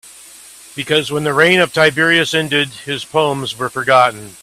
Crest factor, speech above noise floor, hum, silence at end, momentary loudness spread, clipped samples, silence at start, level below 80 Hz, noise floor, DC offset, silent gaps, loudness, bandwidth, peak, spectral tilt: 16 dB; 24 dB; none; 0.1 s; 10 LU; under 0.1%; 0.05 s; -56 dBFS; -39 dBFS; under 0.1%; none; -14 LUFS; 15.5 kHz; 0 dBFS; -4 dB/octave